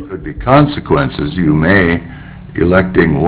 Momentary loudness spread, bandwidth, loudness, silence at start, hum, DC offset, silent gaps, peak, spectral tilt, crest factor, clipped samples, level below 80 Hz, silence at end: 15 LU; 4 kHz; -12 LUFS; 0 s; none; under 0.1%; none; 0 dBFS; -11 dB/octave; 12 dB; 0.3%; -28 dBFS; 0 s